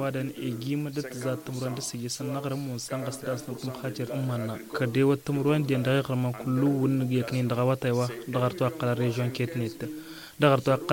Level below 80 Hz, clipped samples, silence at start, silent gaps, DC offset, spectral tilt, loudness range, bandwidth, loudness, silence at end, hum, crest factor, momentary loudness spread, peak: -64 dBFS; under 0.1%; 0 s; none; under 0.1%; -6.5 dB/octave; 6 LU; 17 kHz; -28 LUFS; 0 s; none; 20 dB; 9 LU; -8 dBFS